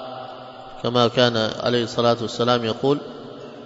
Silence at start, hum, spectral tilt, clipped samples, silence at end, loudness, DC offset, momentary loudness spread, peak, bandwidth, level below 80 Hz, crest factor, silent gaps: 0 s; none; -5.5 dB/octave; under 0.1%; 0 s; -21 LUFS; under 0.1%; 19 LU; -2 dBFS; 7.8 kHz; -58 dBFS; 20 dB; none